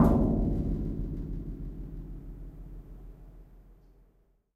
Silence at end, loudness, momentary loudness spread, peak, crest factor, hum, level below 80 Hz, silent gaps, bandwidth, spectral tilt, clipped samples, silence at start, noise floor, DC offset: 0.8 s; -32 LUFS; 23 LU; -10 dBFS; 22 dB; none; -36 dBFS; none; 13.5 kHz; -10.5 dB/octave; under 0.1%; 0 s; -66 dBFS; under 0.1%